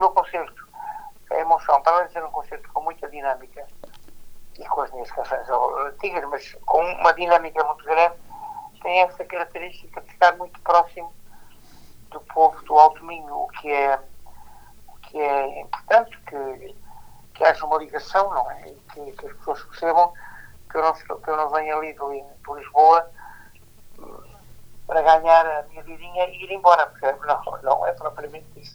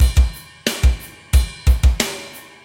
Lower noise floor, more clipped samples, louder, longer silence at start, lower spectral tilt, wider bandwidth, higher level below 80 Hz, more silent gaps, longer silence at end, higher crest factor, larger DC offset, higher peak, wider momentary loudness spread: first, -46 dBFS vs -36 dBFS; neither; about the same, -21 LUFS vs -19 LUFS; about the same, 0 s vs 0 s; about the same, -4 dB/octave vs -4.5 dB/octave; first, over 20 kHz vs 16.5 kHz; second, -50 dBFS vs -18 dBFS; neither; second, 0.05 s vs 0.25 s; first, 22 dB vs 14 dB; neither; about the same, 0 dBFS vs -2 dBFS; first, 21 LU vs 12 LU